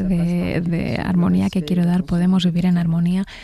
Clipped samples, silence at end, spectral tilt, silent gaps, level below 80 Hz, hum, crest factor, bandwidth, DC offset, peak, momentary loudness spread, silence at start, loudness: under 0.1%; 0 s; -8 dB/octave; none; -40 dBFS; none; 12 dB; 11.5 kHz; under 0.1%; -6 dBFS; 4 LU; 0 s; -19 LUFS